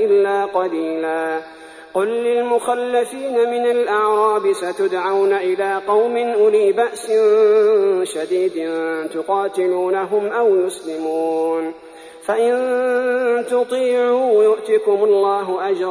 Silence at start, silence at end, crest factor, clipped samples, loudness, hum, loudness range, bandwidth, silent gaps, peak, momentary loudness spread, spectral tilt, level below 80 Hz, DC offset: 0 s; 0 s; 12 dB; under 0.1%; -18 LUFS; none; 4 LU; 11 kHz; none; -6 dBFS; 8 LU; -4 dB/octave; -68 dBFS; under 0.1%